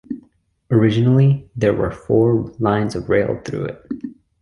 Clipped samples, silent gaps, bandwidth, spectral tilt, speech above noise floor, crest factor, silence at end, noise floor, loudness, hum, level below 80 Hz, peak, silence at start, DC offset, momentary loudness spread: under 0.1%; none; 11 kHz; -8.5 dB/octave; 39 dB; 16 dB; 0.3 s; -57 dBFS; -18 LUFS; none; -44 dBFS; -2 dBFS; 0.1 s; under 0.1%; 16 LU